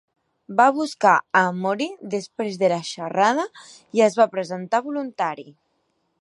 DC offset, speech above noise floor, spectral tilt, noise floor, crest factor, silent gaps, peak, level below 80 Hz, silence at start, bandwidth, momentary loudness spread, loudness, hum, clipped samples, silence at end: under 0.1%; 49 dB; -4.5 dB/octave; -70 dBFS; 20 dB; none; -2 dBFS; -76 dBFS; 0.5 s; 11.5 kHz; 11 LU; -21 LUFS; none; under 0.1%; 0.7 s